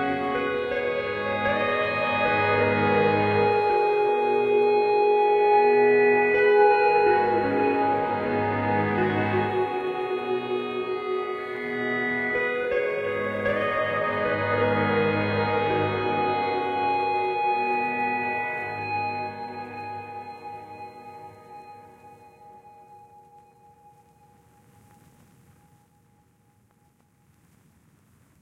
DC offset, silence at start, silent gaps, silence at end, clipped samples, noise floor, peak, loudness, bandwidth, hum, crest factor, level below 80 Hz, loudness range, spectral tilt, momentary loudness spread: under 0.1%; 0 s; none; 5.45 s; under 0.1%; -63 dBFS; -8 dBFS; -23 LUFS; 5.8 kHz; none; 16 dB; -60 dBFS; 13 LU; -7.5 dB/octave; 15 LU